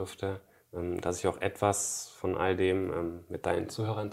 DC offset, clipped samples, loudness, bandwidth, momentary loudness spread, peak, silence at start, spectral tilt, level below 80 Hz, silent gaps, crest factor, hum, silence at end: under 0.1%; under 0.1%; -32 LUFS; 16 kHz; 9 LU; -12 dBFS; 0 s; -4.5 dB/octave; -62 dBFS; none; 20 dB; none; 0 s